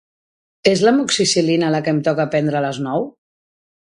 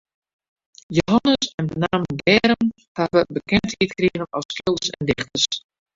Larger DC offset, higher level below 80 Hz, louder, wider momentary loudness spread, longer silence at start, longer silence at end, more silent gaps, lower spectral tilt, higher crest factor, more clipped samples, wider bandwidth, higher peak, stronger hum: neither; second, -60 dBFS vs -48 dBFS; first, -17 LUFS vs -21 LUFS; about the same, 8 LU vs 8 LU; second, 0.65 s vs 0.9 s; first, 0.7 s vs 0.35 s; second, none vs 1.54-1.58 s, 2.88-2.95 s, 4.45-4.49 s; about the same, -4.5 dB/octave vs -4.5 dB/octave; about the same, 18 dB vs 20 dB; neither; first, 11.5 kHz vs 7.8 kHz; about the same, 0 dBFS vs -2 dBFS; neither